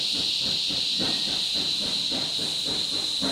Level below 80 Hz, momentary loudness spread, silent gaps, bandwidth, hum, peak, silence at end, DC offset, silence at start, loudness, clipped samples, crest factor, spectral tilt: -58 dBFS; 2 LU; none; over 20 kHz; none; -12 dBFS; 0 s; under 0.1%; 0 s; -23 LUFS; under 0.1%; 14 dB; -1.5 dB/octave